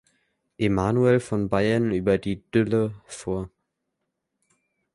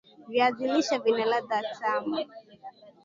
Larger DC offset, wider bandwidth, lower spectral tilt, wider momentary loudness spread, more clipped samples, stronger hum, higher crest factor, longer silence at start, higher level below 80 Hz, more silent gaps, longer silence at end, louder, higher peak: neither; first, 11.5 kHz vs 7.6 kHz; first, -7 dB/octave vs -3.5 dB/octave; second, 10 LU vs 22 LU; neither; neither; about the same, 18 dB vs 18 dB; first, 0.6 s vs 0.2 s; first, -50 dBFS vs -78 dBFS; neither; first, 1.5 s vs 0.15 s; first, -24 LUFS vs -27 LUFS; first, -6 dBFS vs -10 dBFS